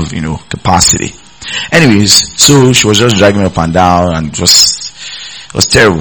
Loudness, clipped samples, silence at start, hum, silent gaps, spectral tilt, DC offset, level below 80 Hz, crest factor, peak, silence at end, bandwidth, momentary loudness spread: -7 LUFS; 5%; 0 s; none; none; -3 dB/octave; 0.8%; -32 dBFS; 8 dB; 0 dBFS; 0 s; over 20 kHz; 16 LU